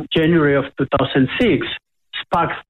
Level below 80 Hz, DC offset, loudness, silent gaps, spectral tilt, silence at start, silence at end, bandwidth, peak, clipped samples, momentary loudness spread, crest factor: -44 dBFS; under 0.1%; -17 LUFS; none; -8 dB/octave; 0 s; 0.1 s; 9.2 kHz; -6 dBFS; under 0.1%; 14 LU; 12 dB